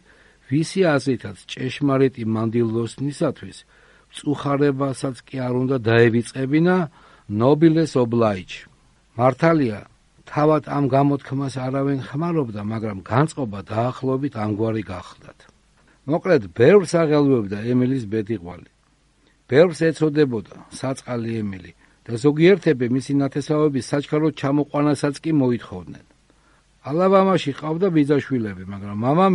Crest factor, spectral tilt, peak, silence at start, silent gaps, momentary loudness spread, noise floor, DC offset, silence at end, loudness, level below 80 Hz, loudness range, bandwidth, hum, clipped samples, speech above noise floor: 20 dB; -7 dB/octave; -2 dBFS; 0.5 s; none; 14 LU; -60 dBFS; under 0.1%; 0 s; -20 LUFS; -56 dBFS; 4 LU; 11.5 kHz; none; under 0.1%; 40 dB